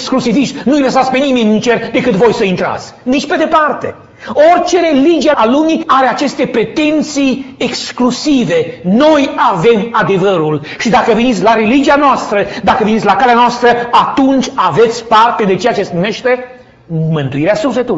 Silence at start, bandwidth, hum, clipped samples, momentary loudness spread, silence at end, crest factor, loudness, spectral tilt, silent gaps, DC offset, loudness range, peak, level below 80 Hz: 0 s; 8 kHz; none; under 0.1%; 7 LU; 0 s; 10 dB; -11 LUFS; -5.5 dB/octave; none; under 0.1%; 3 LU; 0 dBFS; -44 dBFS